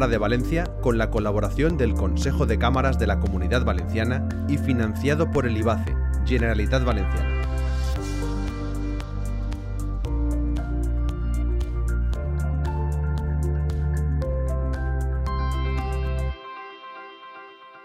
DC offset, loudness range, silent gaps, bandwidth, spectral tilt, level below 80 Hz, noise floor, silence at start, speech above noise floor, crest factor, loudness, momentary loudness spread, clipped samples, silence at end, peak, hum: under 0.1%; 5 LU; none; 12.5 kHz; -7 dB/octave; -26 dBFS; -44 dBFS; 0 s; 22 dB; 16 dB; -25 LUFS; 9 LU; under 0.1%; 0 s; -8 dBFS; none